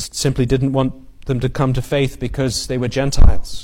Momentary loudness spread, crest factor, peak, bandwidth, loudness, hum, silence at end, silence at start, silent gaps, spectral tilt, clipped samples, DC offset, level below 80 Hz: 5 LU; 14 dB; 0 dBFS; 14.5 kHz; -19 LUFS; none; 0 s; 0 s; none; -5.5 dB/octave; under 0.1%; under 0.1%; -20 dBFS